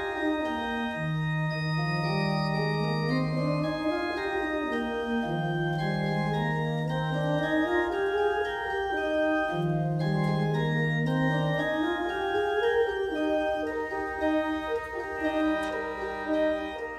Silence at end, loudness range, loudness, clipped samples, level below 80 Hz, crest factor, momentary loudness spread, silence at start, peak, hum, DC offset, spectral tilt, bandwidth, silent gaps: 0 s; 2 LU; -28 LUFS; under 0.1%; -52 dBFS; 14 dB; 4 LU; 0 s; -14 dBFS; none; under 0.1%; -7 dB/octave; 10.5 kHz; none